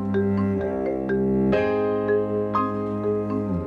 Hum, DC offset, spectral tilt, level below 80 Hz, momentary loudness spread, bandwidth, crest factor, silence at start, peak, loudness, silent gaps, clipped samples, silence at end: none; under 0.1%; -9.5 dB/octave; -48 dBFS; 5 LU; 5.6 kHz; 12 dB; 0 s; -10 dBFS; -24 LUFS; none; under 0.1%; 0 s